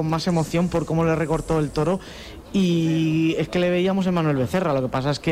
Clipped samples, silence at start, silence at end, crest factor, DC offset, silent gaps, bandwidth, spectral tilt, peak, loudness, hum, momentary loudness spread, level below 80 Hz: under 0.1%; 0 s; 0 s; 10 dB; under 0.1%; none; 15 kHz; -6.5 dB/octave; -12 dBFS; -22 LUFS; none; 4 LU; -44 dBFS